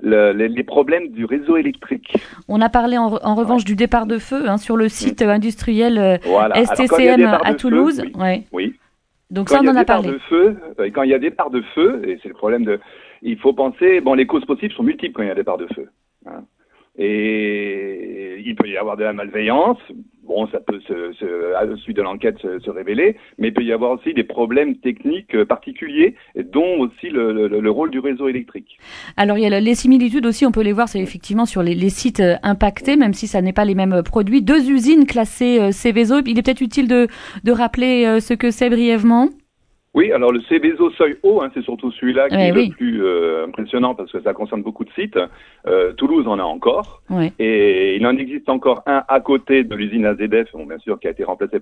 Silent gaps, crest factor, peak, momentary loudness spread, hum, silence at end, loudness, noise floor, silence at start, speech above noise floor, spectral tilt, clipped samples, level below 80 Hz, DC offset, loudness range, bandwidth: none; 16 dB; 0 dBFS; 11 LU; none; 0 s; -17 LUFS; -62 dBFS; 0 s; 46 dB; -6 dB/octave; under 0.1%; -42 dBFS; under 0.1%; 6 LU; 11 kHz